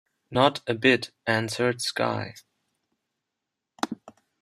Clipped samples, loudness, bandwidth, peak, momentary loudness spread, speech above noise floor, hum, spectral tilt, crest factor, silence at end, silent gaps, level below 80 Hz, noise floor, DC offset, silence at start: under 0.1%; -25 LUFS; 15 kHz; -4 dBFS; 12 LU; 60 dB; none; -4.5 dB/octave; 24 dB; 0.3 s; none; -66 dBFS; -85 dBFS; under 0.1%; 0.3 s